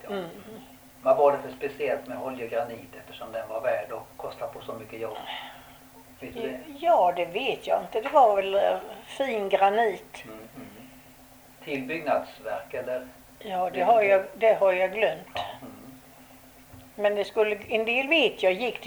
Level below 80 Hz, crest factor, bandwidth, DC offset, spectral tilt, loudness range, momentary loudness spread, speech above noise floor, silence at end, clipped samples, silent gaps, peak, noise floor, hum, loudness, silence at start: -64 dBFS; 18 dB; over 20 kHz; under 0.1%; -4.5 dB/octave; 9 LU; 22 LU; 26 dB; 0 s; under 0.1%; none; -8 dBFS; -52 dBFS; none; -26 LUFS; 0.05 s